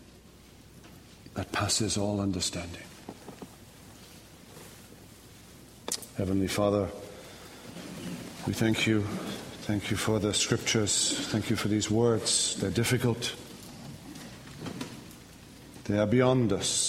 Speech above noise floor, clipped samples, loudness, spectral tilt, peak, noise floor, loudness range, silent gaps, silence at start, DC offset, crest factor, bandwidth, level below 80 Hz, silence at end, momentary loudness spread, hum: 25 dB; under 0.1%; -28 LUFS; -4 dB/octave; -10 dBFS; -53 dBFS; 10 LU; none; 0 s; under 0.1%; 22 dB; 16 kHz; -56 dBFS; 0 s; 24 LU; none